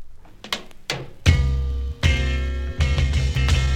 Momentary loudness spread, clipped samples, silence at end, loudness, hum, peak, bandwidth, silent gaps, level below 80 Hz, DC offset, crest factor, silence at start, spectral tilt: 10 LU; under 0.1%; 0 s; -23 LUFS; none; -4 dBFS; 13 kHz; none; -24 dBFS; under 0.1%; 18 dB; 0 s; -5 dB/octave